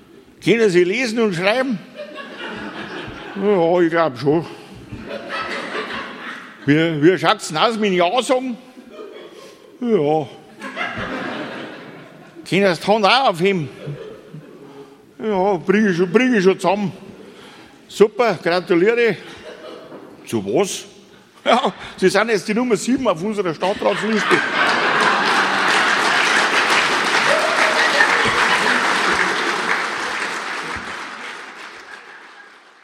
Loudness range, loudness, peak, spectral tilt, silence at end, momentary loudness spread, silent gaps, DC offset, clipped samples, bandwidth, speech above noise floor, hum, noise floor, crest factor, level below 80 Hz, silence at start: 7 LU; -17 LUFS; 0 dBFS; -4 dB/octave; 0.4 s; 20 LU; none; under 0.1%; under 0.1%; 16 kHz; 29 dB; none; -46 dBFS; 20 dB; -58 dBFS; 0.15 s